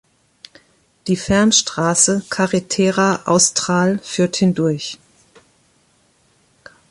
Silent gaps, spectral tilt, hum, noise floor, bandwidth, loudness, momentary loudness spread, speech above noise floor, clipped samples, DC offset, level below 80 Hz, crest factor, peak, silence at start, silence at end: none; -3.5 dB/octave; none; -58 dBFS; 11.5 kHz; -16 LUFS; 9 LU; 42 dB; under 0.1%; under 0.1%; -50 dBFS; 18 dB; 0 dBFS; 1.05 s; 1.95 s